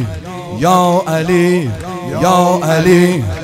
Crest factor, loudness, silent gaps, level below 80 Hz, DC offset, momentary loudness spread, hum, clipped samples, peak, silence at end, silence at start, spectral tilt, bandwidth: 12 dB; -12 LUFS; none; -40 dBFS; under 0.1%; 13 LU; none; 0.3%; 0 dBFS; 0 s; 0 s; -6 dB/octave; 16.5 kHz